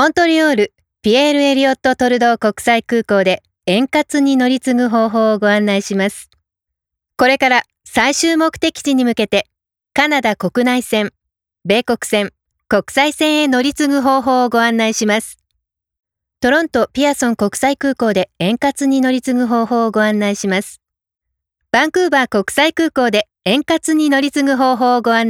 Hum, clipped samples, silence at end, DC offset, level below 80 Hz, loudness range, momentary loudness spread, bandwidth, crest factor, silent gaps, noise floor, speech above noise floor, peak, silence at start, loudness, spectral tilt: none; under 0.1%; 0 s; under 0.1%; -52 dBFS; 2 LU; 5 LU; 16.5 kHz; 14 dB; none; -82 dBFS; 68 dB; 0 dBFS; 0 s; -15 LUFS; -4 dB/octave